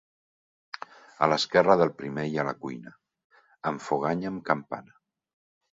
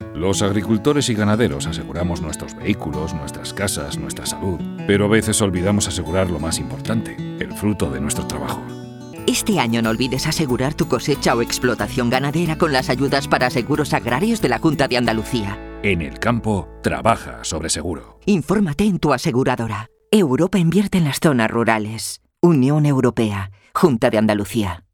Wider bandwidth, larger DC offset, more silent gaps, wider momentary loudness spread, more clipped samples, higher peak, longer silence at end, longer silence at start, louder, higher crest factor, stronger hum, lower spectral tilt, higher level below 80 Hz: second, 7.8 kHz vs 18.5 kHz; neither; first, 3.24-3.30 s vs none; first, 20 LU vs 9 LU; neither; second, -6 dBFS vs -2 dBFS; first, 0.9 s vs 0.15 s; first, 0.75 s vs 0 s; second, -27 LUFS vs -19 LUFS; first, 24 dB vs 18 dB; neither; about the same, -5.5 dB/octave vs -5 dB/octave; second, -68 dBFS vs -40 dBFS